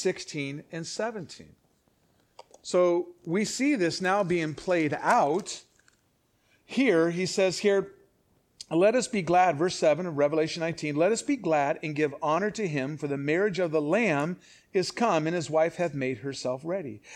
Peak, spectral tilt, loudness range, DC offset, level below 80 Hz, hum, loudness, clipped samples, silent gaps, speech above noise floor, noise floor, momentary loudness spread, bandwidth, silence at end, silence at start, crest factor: -10 dBFS; -5 dB/octave; 3 LU; under 0.1%; -68 dBFS; none; -27 LUFS; under 0.1%; none; 43 dB; -70 dBFS; 10 LU; 13.5 kHz; 0 s; 0 s; 18 dB